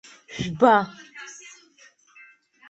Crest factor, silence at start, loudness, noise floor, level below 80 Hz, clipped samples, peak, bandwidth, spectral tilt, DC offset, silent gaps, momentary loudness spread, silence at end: 24 dB; 0.3 s; -21 LUFS; -56 dBFS; -60 dBFS; under 0.1%; -4 dBFS; 8.2 kHz; -5 dB/octave; under 0.1%; none; 22 LU; 1.4 s